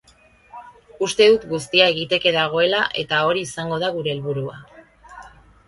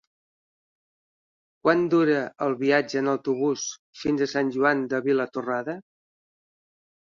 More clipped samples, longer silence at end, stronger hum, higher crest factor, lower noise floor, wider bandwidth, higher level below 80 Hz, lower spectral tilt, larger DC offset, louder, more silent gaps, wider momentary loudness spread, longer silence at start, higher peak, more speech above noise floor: neither; second, 0.4 s vs 1.25 s; neither; about the same, 20 dB vs 20 dB; second, -53 dBFS vs under -90 dBFS; first, 11.5 kHz vs 7.4 kHz; first, -56 dBFS vs -68 dBFS; about the same, -4 dB/octave vs -5 dB/octave; neither; first, -19 LUFS vs -24 LUFS; second, none vs 3.79-3.93 s; about the same, 11 LU vs 9 LU; second, 0.55 s vs 1.65 s; first, 0 dBFS vs -6 dBFS; second, 34 dB vs over 66 dB